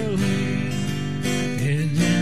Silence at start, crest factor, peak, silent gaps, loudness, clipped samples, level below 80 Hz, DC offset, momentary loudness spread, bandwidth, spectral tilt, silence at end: 0 s; 14 dB; -10 dBFS; none; -23 LUFS; under 0.1%; -48 dBFS; 2%; 5 LU; 14 kHz; -5.5 dB/octave; 0 s